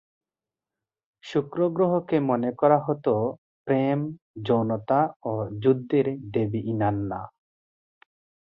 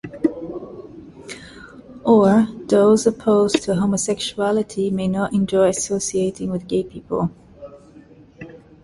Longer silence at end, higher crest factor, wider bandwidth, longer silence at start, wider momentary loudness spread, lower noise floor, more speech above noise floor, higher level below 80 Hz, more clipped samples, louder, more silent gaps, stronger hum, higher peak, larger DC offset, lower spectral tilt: first, 1.2 s vs 0.3 s; about the same, 20 dB vs 18 dB; second, 7.2 kHz vs 11.5 kHz; first, 1.25 s vs 0.05 s; second, 10 LU vs 24 LU; first, under -90 dBFS vs -46 dBFS; first, over 66 dB vs 28 dB; second, -60 dBFS vs -52 dBFS; neither; second, -25 LUFS vs -19 LUFS; first, 3.38-3.65 s, 4.22-4.34 s, 5.16-5.20 s vs none; neither; second, -6 dBFS vs -2 dBFS; neither; first, -9.5 dB/octave vs -5.5 dB/octave